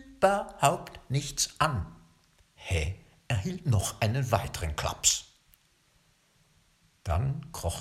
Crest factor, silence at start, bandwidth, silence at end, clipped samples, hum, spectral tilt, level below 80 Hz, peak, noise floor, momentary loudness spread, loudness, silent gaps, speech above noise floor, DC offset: 22 dB; 0 s; 16.5 kHz; 0 s; under 0.1%; none; -4 dB/octave; -44 dBFS; -8 dBFS; -67 dBFS; 11 LU; -29 LUFS; none; 38 dB; under 0.1%